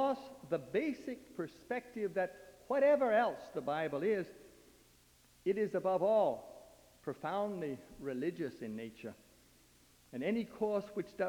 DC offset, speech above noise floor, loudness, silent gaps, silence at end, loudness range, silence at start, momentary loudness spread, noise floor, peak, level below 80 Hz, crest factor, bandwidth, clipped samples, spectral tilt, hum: under 0.1%; 30 dB; -37 LUFS; none; 0 s; 7 LU; 0 s; 15 LU; -66 dBFS; -20 dBFS; -72 dBFS; 16 dB; 20 kHz; under 0.1%; -6.5 dB/octave; none